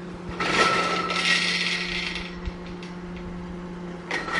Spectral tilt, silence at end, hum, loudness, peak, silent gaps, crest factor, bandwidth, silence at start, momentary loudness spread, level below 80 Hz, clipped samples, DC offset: -3 dB/octave; 0 s; none; -23 LUFS; -6 dBFS; none; 22 dB; 11.5 kHz; 0 s; 16 LU; -44 dBFS; under 0.1%; under 0.1%